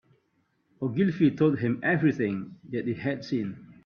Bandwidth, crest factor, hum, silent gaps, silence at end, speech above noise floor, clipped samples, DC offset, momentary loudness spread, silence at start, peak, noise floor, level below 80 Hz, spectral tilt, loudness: 6.6 kHz; 16 dB; none; none; 0.15 s; 45 dB; under 0.1%; under 0.1%; 11 LU; 0.8 s; -10 dBFS; -72 dBFS; -66 dBFS; -8.5 dB/octave; -27 LUFS